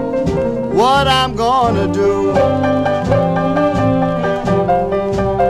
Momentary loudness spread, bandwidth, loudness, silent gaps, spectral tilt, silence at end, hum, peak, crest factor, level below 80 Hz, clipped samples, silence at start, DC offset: 5 LU; 14 kHz; -15 LUFS; none; -6.5 dB/octave; 0 s; none; 0 dBFS; 14 dB; -34 dBFS; under 0.1%; 0 s; under 0.1%